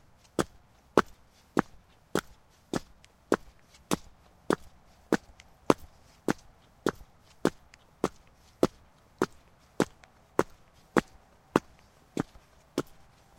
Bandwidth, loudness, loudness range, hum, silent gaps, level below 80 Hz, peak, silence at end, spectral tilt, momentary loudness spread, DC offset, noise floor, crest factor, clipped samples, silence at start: 16.5 kHz; -33 LUFS; 2 LU; none; none; -58 dBFS; -4 dBFS; 0.55 s; -5 dB/octave; 9 LU; under 0.1%; -59 dBFS; 30 dB; under 0.1%; 0.4 s